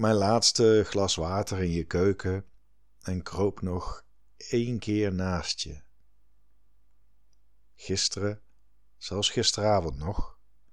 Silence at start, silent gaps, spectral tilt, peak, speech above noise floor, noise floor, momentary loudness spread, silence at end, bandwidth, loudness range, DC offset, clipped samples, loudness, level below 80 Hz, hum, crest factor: 0 s; none; -4.5 dB/octave; -8 dBFS; 41 dB; -68 dBFS; 18 LU; 0.4 s; 13 kHz; 8 LU; 0.5%; under 0.1%; -27 LUFS; -46 dBFS; none; 20 dB